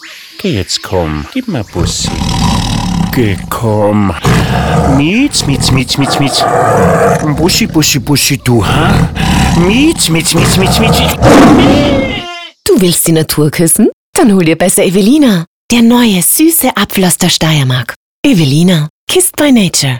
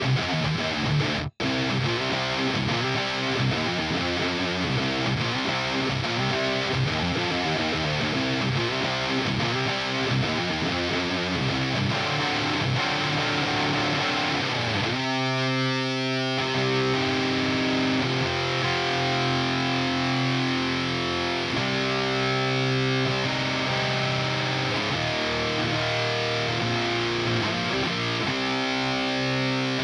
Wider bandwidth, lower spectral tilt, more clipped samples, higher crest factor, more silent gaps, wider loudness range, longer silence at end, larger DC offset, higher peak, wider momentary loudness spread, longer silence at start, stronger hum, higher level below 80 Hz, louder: first, over 20 kHz vs 10.5 kHz; about the same, -4.5 dB/octave vs -5 dB/octave; first, 0.5% vs under 0.1%; second, 8 dB vs 14 dB; first, 13.93-14.13 s, 15.47-15.69 s, 17.96-18.23 s, 18.90-19.07 s vs none; first, 4 LU vs 1 LU; about the same, 0 s vs 0 s; first, 0.7% vs under 0.1%; first, 0 dBFS vs -10 dBFS; first, 8 LU vs 2 LU; about the same, 0 s vs 0 s; neither; first, -26 dBFS vs -50 dBFS; first, -9 LUFS vs -24 LUFS